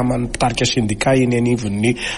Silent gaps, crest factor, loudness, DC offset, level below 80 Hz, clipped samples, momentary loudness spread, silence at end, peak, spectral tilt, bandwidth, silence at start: none; 12 dB; -17 LUFS; under 0.1%; -36 dBFS; under 0.1%; 4 LU; 0 s; -4 dBFS; -5 dB/octave; 11.5 kHz; 0 s